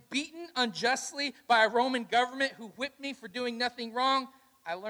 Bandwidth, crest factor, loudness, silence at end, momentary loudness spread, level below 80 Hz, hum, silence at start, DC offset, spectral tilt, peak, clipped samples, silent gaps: over 20 kHz; 20 dB; -30 LUFS; 0 s; 13 LU; -78 dBFS; none; 0.1 s; under 0.1%; -2 dB/octave; -12 dBFS; under 0.1%; none